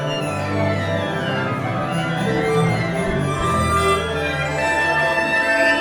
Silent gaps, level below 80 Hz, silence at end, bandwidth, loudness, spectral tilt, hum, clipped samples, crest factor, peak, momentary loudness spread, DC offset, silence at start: none; -40 dBFS; 0 s; 19 kHz; -19 LUFS; -5.5 dB/octave; none; under 0.1%; 14 dB; -4 dBFS; 5 LU; under 0.1%; 0 s